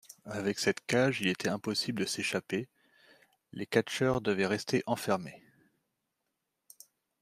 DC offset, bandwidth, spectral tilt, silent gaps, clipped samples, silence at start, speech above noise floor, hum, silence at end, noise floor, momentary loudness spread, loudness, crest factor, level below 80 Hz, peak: under 0.1%; 15.5 kHz; -4.5 dB/octave; none; under 0.1%; 0.1 s; 53 dB; none; 1.85 s; -84 dBFS; 10 LU; -32 LUFS; 24 dB; -66 dBFS; -10 dBFS